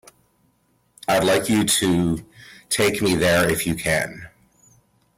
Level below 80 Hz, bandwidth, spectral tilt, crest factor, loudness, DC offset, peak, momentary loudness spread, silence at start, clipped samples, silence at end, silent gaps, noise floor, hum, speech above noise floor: -48 dBFS; 16.5 kHz; -4 dB/octave; 14 dB; -20 LUFS; under 0.1%; -8 dBFS; 11 LU; 1.1 s; under 0.1%; 0.9 s; none; -64 dBFS; none; 44 dB